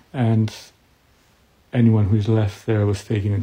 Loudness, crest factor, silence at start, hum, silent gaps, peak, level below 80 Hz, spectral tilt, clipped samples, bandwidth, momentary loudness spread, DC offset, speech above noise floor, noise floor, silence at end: -20 LUFS; 16 dB; 0.15 s; none; none; -6 dBFS; -52 dBFS; -8 dB/octave; under 0.1%; 9.2 kHz; 9 LU; under 0.1%; 39 dB; -57 dBFS; 0 s